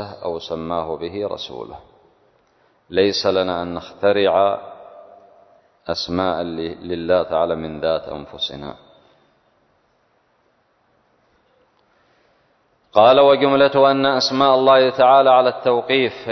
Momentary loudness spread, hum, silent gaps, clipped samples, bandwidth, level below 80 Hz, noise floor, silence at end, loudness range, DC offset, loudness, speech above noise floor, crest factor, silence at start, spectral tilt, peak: 16 LU; none; none; under 0.1%; 6.4 kHz; -52 dBFS; -62 dBFS; 0 s; 13 LU; under 0.1%; -17 LUFS; 45 dB; 18 dB; 0 s; -5 dB/octave; 0 dBFS